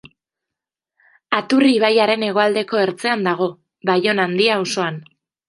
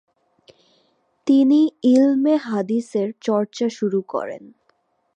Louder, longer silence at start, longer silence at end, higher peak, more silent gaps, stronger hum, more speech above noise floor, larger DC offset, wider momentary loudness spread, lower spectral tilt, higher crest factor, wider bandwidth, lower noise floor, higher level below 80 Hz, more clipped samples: about the same, -18 LUFS vs -19 LUFS; about the same, 1.3 s vs 1.25 s; second, 0.45 s vs 0.7 s; first, 0 dBFS vs -6 dBFS; neither; neither; first, 68 dB vs 47 dB; neither; second, 8 LU vs 12 LU; second, -4.5 dB/octave vs -6.5 dB/octave; about the same, 18 dB vs 14 dB; first, 11.5 kHz vs 9 kHz; first, -85 dBFS vs -66 dBFS; first, -70 dBFS vs -76 dBFS; neither